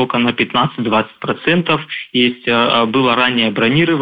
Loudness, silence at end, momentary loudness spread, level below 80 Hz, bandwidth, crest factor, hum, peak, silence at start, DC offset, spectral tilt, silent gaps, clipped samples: -15 LUFS; 0 s; 5 LU; -52 dBFS; 5 kHz; 14 dB; none; -2 dBFS; 0 s; under 0.1%; -8 dB/octave; none; under 0.1%